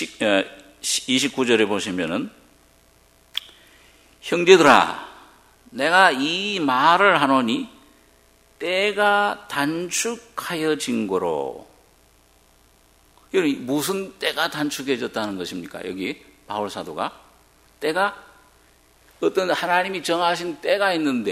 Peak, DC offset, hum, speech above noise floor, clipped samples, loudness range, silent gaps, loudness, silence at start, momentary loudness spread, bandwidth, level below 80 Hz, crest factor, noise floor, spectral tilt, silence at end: 0 dBFS; under 0.1%; none; 35 dB; under 0.1%; 10 LU; none; -21 LUFS; 0 s; 16 LU; 16 kHz; -62 dBFS; 22 dB; -56 dBFS; -3 dB/octave; 0 s